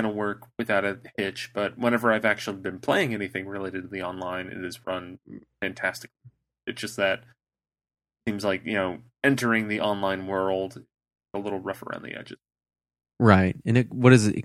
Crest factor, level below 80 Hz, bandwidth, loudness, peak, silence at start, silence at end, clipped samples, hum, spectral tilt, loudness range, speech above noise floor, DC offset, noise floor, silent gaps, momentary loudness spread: 26 dB; -62 dBFS; 15 kHz; -26 LUFS; 0 dBFS; 0 s; 0 s; under 0.1%; none; -6 dB/octave; 6 LU; over 64 dB; under 0.1%; under -90 dBFS; none; 15 LU